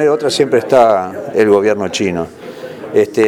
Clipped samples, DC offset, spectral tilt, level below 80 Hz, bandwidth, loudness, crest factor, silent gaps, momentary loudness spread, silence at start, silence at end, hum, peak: 0.1%; under 0.1%; -5 dB/octave; -52 dBFS; 15 kHz; -13 LUFS; 14 dB; none; 16 LU; 0 s; 0 s; none; 0 dBFS